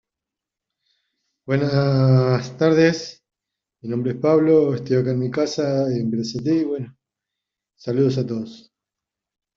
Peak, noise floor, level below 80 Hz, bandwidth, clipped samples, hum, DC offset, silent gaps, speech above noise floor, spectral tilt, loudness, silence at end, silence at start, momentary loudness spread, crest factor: -4 dBFS; -86 dBFS; -60 dBFS; 7.4 kHz; under 0.1%; none; under 0.1%; none; 67 dB; -7.5 dB/octave; -20 LUFS; 1 s; 1.45 s; 14 LU; 18 dB